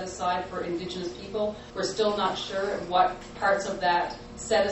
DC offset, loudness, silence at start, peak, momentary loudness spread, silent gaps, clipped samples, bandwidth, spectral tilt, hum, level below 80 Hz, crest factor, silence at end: under 0.1%; -28 LUFS; 0 s; -10 dBFS; 8 LU; none; under 0.1%; 8.4 kHz; -3.5 dB/octave; none; -52 dBFS; 18 dB; 0 s